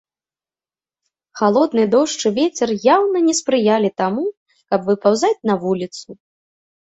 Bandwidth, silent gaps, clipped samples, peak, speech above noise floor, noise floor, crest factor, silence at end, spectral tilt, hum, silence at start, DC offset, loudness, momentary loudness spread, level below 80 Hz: 8.4 kHz; 4.37-4.46 s; under 0.1%; -2 dBFS; over 73 dB; under -90 dBFS; 16 dB; 0.7 s; -4.5 dB/octave; none; 1.35 s; under 0.1%; -17 LUFS; 8 LU; -64 dBFS